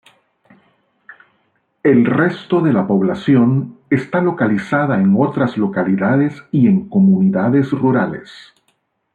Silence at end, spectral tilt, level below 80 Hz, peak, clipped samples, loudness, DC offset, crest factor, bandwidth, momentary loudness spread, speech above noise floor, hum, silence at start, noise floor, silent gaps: 0.75 s; -9.5 dB/octave; -58 dBFS; -2 dBFS; under 0.1%; -15 LUFS; under 0.1%; 14 dB; 6.8 kHz; 6 LU; 50 dB; none; 1.1 s; -65 dBFS; none